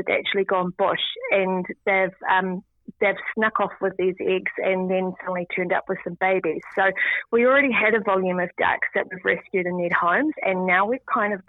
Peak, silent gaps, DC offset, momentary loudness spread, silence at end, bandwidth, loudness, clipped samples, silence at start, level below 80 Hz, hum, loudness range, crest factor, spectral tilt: -6 dBFS; none; under 0.1%; 6 LU; 0.05 s; 4.1 kHz; -22 LUFS; under 0.1%; 0 s; -66 dBFS; none; 3 LU; 16 dB; -8.5 dB/octave